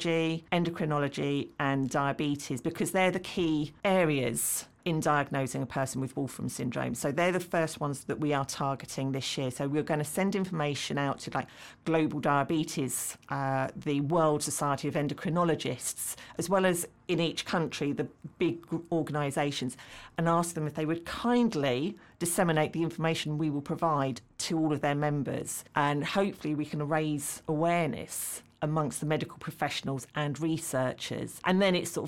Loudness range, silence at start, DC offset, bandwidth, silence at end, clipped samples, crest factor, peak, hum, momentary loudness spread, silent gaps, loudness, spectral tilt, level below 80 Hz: 2 LU; 0 s; under 0.1%; 17 kHz; 0 s; under 0.1%; 20 dB; -12 dBFS; none; 8 LU; none; -31 LUFS; -5 dB/octave; -64 dBFS